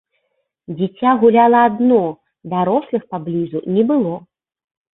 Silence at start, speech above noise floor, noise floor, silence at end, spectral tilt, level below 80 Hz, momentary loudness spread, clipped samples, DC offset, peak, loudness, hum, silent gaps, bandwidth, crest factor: 0.7 s; 55 dB; -70 dBFS; 0.75 s; -12 dB/octave; -62 dBFS; 13 LU; under 0.1%; under 0.1%; -2 dBFS; -16 LUFS; none; none; 4 kHz; 16 dB